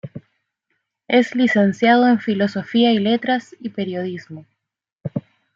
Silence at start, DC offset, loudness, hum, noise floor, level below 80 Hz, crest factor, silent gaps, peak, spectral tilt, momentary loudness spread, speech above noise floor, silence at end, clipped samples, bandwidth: 0.05 s; under 0.1%; -18 LUFS; none; -73 dBFS; -66 dBFS; 18 dB; 4.92-4.96 s; -2 dBFS; -6.5 dB/octave; 16 LU; 56 dB; 0.35 s; under 0.1%; 7.4 kHz